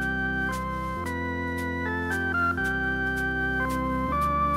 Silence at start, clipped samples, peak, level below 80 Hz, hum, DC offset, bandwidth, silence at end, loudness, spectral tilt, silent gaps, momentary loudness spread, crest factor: 0 s; under 0.1%; -16 dBFS; -38 dBFS; none; under 0.1%; 16 kHz; 0 s; -27 LUFS; -6 dB/octave; none; 5 LU; 12 dB